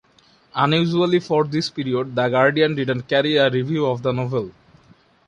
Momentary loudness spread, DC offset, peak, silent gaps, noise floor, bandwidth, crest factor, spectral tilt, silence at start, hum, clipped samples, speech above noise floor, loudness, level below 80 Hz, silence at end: 7 LU; under 0.1%; -2 dBFS; none; -56 dBFS; 10.5 kHz; 18 dB; -6.5 dB/octave; 0.55 s; none; under 0.1%; 36 dB; -20 LUFS; -58 dBFS; 0.8 s